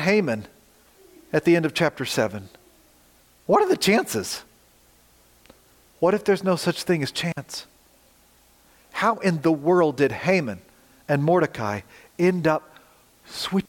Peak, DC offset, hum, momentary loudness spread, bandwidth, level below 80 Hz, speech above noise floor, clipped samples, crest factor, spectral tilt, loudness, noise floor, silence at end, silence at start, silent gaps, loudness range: -6 dBFS; under 0.1%; none; 14 LU; 17 kHz; -62 dBFS; 35 dB; under 0.1%; 18 dB; -5.5 dB/octave; -23 LUFS; -57 dBFS; 0.05 s; 0 s; none; 3 LU